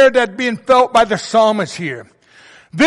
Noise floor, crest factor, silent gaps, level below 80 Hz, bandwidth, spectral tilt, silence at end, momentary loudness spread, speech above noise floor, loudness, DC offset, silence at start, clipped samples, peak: -45 dBFS; 12 dB; none; -52 dBFS; 11.5 kHz; -4.5 dB/octave; 0 s; 14 LU; 30 dB; -14 LUFS; under 0.1%; 0 s; under 0.1%; -2 dBFS